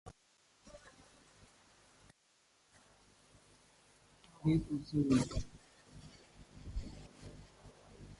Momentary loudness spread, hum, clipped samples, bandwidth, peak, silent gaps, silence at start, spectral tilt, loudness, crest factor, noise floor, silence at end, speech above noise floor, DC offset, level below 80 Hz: 28 LU; none; under 0.1%; 11.5 kHz; -20 dBFS; none; 0.05 s; -7 dB/octave; -36 LUFS; 22 dB; -73 dBFS; 0.05 s; 39 dB; under 0.1%; -54 dBFS